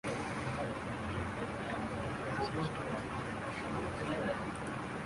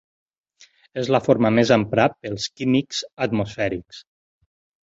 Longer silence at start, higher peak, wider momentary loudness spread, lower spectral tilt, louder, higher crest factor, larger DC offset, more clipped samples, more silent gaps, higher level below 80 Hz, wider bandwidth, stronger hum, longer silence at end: second, 0.05 s vs 0.95 s; second, -22 dBFS vs -2 dBFS; second, 3 LU vs 11 LU; about the same, -6 dB/octave vs -5.5 dB/octave; second, -38 LUFS vs -21 LUFS; about the same, 16 dB vs 20 dB; neither; neither; neither; about the same, -54 dBFS vs -54 dBFS; first, 11.5 kHz vs 8 kHz; neither; second, 0 s vs 0.9 s